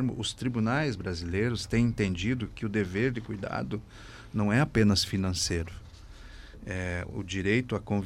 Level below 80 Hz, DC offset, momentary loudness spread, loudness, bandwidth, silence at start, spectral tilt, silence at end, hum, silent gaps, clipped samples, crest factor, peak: -46 dBFS; under 0.1%; 15 LU; -29 LUFS; 15.5 kHz; 0 s; -5.5 dB/octave; 0 s; none; none; under 0.1%; 18 dB; -12 dBFS